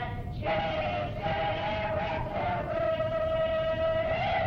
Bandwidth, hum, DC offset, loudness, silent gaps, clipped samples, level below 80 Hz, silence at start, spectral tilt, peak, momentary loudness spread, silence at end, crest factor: 6.6 kHz; none; under 0.1%; -30 LUFS; none; under 0.1%; -44 dBFS; 0 s; -7.5 dB/octave; -18 dBFS; 4 LU; 0 s; 12 dB